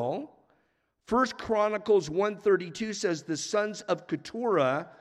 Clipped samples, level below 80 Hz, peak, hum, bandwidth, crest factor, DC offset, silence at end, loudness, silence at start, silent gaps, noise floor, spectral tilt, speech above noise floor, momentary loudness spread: under 0.1%; -64 dBFS; -12 dBFS; none; 11 kHz; 18 dB; under 0.1%; 0.1 s; -29 LUFS; 0 s; none; -73 dBFS; -4.5 dB/octave; 45 dB; 8 LU